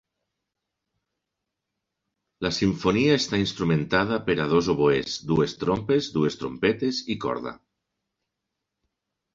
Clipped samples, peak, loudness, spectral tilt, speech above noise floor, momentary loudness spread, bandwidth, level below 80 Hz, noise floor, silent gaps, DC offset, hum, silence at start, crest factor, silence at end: under 0.1%; -6 dBFS; -24 LUFS; -5.5 dB/octave; 60 dB; 7 LU; 7.8 kHz; -52 dBFS; -84 dBFS; none; under 0.1%; none; 2.4 s; 20 dB; 1.8 s